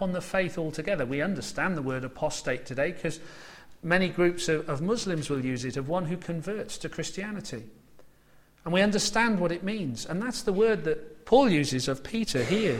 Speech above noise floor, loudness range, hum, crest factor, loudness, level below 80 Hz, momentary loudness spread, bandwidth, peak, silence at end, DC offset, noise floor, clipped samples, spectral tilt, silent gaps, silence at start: 31 dB; 6 LU; none; 20 dB; -28 LUFS; -52 dBFS; 11 LU; 16 kHz; -8 dBFS; 0 s; under 0.1%; -59 dBFS; under 0.1%; -5 dB/octave; none; 0 s